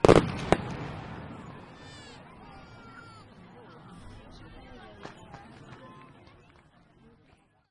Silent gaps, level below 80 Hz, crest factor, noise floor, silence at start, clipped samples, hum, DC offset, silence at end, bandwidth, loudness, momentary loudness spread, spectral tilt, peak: none; -48 dBFS; 30 dB; -63 dBFS; 0.05 s; under 0.1%; none; under 0.1%; 1.85 s; 11.5 kHz; -29 LUFS; 22 LU; -6.5 dB/octave; -2 dBFS